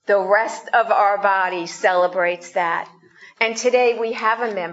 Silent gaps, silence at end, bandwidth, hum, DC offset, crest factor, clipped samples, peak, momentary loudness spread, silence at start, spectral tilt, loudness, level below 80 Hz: none; 0 s; 8 kHz; none; under 0.1%; 18 dB; under 0.1%; -2 dBFS; 6 LU; 0.1 s; -2.5 dB/octave; -19 LUFS; -76 dBFS